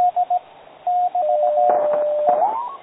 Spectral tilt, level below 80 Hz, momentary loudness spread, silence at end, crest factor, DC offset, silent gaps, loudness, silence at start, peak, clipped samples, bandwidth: -8.5 dB/octave; -72 dBFS; 6 LU; 0.05 s; 16 dB; under 0.1%; none; -19 LUFS; 0 s; -4 dBFS; under 0.1%; 4 kHz